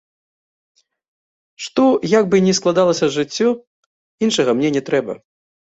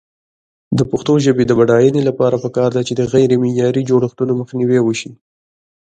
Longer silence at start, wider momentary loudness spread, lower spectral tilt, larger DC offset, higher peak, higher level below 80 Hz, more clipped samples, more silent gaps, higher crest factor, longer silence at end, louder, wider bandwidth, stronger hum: first, 1.6 s vs 0.7 s; first, 11 LU vs 7 LU; second, -5 dB/octave vs -7 dB/octave; neither; about the same, -2 dBFS vs 0 dBFS; second, -60 dBFS vs -50 dBFS; neither; first, 3.67-4.18 s vs none; about the same, 16 dB vs 14 dB; second, 0.6 s vs 0.85 s; about the same, -17 LUFS vs -15 LUFS; about the same, 8.2 kHz vs 9 kHz; neither